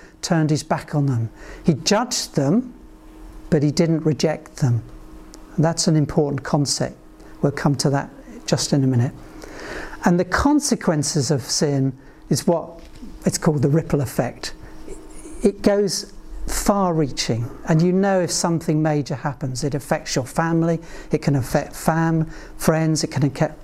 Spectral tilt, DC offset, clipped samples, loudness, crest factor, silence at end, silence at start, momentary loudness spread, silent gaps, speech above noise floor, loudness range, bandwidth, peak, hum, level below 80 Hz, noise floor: -5.5 dB/octave; under 0.1%; under 0.1%; -21 LUFS; 16 dB; 0 s; 0 s; 13 LU; none; 21 dB; 2 LU; 15.5 kHz; -4 dBFS; none; -40 dBFS; -41 dBFS